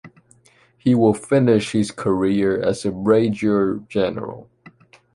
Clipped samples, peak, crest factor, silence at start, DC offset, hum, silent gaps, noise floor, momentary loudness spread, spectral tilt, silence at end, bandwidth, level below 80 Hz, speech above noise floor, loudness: under 0.1%; -4 dBFS; 16 dB; 0.05 s; under 0.1%; none; none; -56 dBFS; 8 LU; -7 dB/octave; 0.7 s; 11.5 kHz; -52 dBFS; 37 dB; -19 LUFS